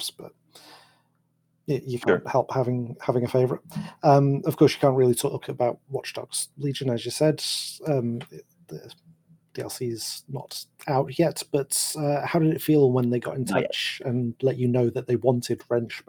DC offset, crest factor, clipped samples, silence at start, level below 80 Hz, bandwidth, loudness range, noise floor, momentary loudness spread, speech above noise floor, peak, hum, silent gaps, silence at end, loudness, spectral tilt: under 0.1%; 20 dB; under 0.1%; 0 s; -66 dBFS; over 20 kHz; 7 LU; -70 dBFS; 15 LU; 45 dB; -6 dBFS; none; none; 0.1 s; -25 LUFS; -5.5 dB/octave